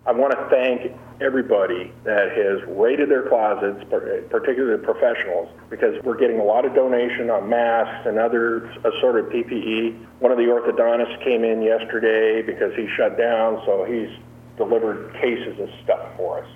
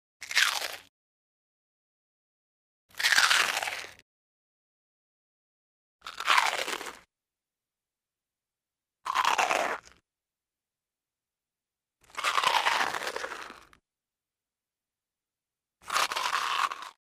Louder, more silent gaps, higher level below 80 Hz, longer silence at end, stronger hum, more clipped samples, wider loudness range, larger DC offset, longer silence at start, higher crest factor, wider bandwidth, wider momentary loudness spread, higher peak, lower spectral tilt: first, -21 LUFS vs -27 LUFS; second, none vs 0.89-2.89 s, 4.02-5.99 s; first, -58 dBFS vs -74 dBFS; about the same, 0 s vs 0.1 s; neither; neither; second, 2 LU vs 5 LU; neither; second, 0.05 s vs 0.2 s; second, 18 dB vs 28 dB; second, 3.8 kHz vs 15.5 kHz; second, 8 LU vs 19 LU; about the same, -4 dBFS vs -6 dBFS; first, -7 dB/octave vs 1.5 dB/octave